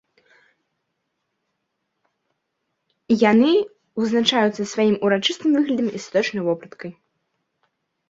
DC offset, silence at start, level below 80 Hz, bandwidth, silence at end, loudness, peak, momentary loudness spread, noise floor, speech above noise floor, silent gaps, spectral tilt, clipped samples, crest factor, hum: under 0.1%; 3.1 s; -66 dBFS; 7.8 kHz; 1.2 s; -20 LUFS; -2 dBFS; 12 LU; -76 dBFS; 57 dB; none; -5 dB/octave; under 0.1%; 20 dB; none